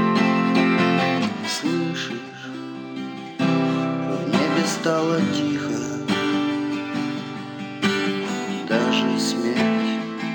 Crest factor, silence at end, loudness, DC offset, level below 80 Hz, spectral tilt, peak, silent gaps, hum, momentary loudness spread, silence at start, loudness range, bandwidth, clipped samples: 18 dB; 0 s; -22 LUFS; under 0.1%; -70 dBFS; -5 dB/octave; -4 dBFS; none; none; 13 LU; 0 s; 2 LU; 17.5 kHz; under 0.1%